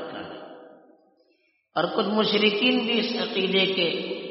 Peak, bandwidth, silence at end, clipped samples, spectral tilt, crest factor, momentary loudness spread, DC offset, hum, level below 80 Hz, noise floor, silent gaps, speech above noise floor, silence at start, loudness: -6 dBFS; 6 kHz; 0 s; under 0.1%; -2 dB/octave; 20 dB; 17 LU; under 0.1%; none; -74 dBFS; -67 dBFS; none; 44 dB; 0 s; -23 LUFS